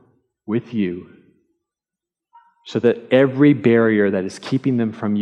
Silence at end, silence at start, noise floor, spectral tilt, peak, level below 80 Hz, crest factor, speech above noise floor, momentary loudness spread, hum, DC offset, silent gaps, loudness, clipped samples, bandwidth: 0 s; 0.5 s; -87 dBFS; -7.5 dB/octave; -2 dBFS; -70 dBFS; 16 dB; 70 dB; 11 LU; none; under 0.1%; none; -18 LUFS; under 0.1%; 9.8 kHz